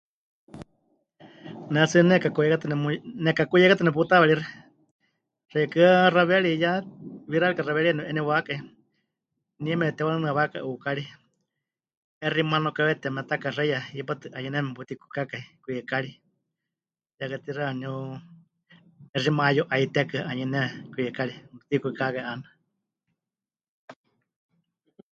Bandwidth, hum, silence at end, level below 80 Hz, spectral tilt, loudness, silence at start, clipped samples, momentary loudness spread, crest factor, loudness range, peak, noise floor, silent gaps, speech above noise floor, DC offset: 8 kHz; none; 1.2 s; -70 dBFS; -6.5 dB/octave; -25 LUFS; 0.55 s; under 0.1%; 16 LU; 22 dB; 12 LU; -4 dBFS; under -90 dBFS; 4.91-4.99 s, 11.97-12.21 s, 17.14-17.18 s, 19.09-19.13 s, 23.69-23.88 s; over 66 dB; under 0.1%